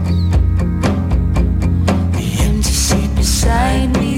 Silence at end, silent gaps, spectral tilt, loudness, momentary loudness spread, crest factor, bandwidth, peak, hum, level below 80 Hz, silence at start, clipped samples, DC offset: 0 s; none; -5 dB/octave; -15 LUFS; 3 LU; 12 dB; 16 kHz; 0 dBFS; none; -18 dBFS; 0 s; under 0.1%; under 0.1%